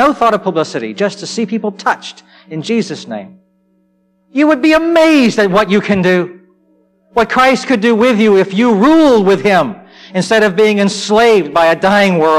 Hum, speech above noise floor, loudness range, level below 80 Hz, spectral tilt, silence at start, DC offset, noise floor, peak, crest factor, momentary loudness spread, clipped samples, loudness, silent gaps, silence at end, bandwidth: none; 46 dB; 8 LU; -48 dBFS; -5.5 dB/octave; 0 s; under 0.1%; -57 dBFS; -2 dBFS; 10 dB; 12 LU; under 0.1%; -11 LUFS; none; 0 s; 15 kHz